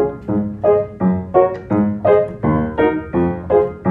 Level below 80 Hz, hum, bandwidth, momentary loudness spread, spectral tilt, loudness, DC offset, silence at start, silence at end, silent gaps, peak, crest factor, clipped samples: -42 dBFS; none; 4 kHz; 4 LU; -11 dB/octave; -17 LUFS; under 0.1%; 0 s; 0 s; none; 0 dBFS; 16 dB; under 0.1%